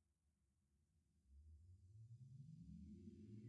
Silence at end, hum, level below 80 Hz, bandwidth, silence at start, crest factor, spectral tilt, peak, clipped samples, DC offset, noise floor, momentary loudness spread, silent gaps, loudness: 0 s; none; -74 dBFS; 7.6 kHz; 0.1 s; 16 dB; -11 dB/octave; -48 dBFS; under 0.1%; under 0.1%; -86 dBFS; 8 LU; none; -63 LUFS